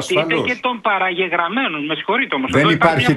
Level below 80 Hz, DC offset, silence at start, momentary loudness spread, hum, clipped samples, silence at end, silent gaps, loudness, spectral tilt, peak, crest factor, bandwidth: -50 dBFS; under 0.1%; 0 s; 6 LU; none; under 0.1%; 0 s; none; -17 LUFS; -5 dB/octave; 0 dBFS; 16 dB; 12 kHz